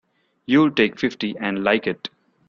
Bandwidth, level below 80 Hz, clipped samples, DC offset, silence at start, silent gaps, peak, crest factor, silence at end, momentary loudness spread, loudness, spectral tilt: 7 kHz; -62 dBFS; under 0.1%; under 0.1%; 0.5 s; none; -2 dBFS; 18 dB; 0.4 s; 15 LU; -20 LUFS; -6.5 dB/octave